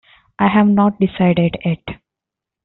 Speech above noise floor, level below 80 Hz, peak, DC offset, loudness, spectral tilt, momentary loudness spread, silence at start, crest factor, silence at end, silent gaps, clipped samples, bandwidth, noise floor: 70 dB; -48 dBFS; -2 dBFS; under 0.1%; -16 LUFS; -6.5 dB/octave; 11 LU; 0.4 s; 14 dB; 0.7 s; none; under 0.1%; 4.1 kHz; -85 dBFS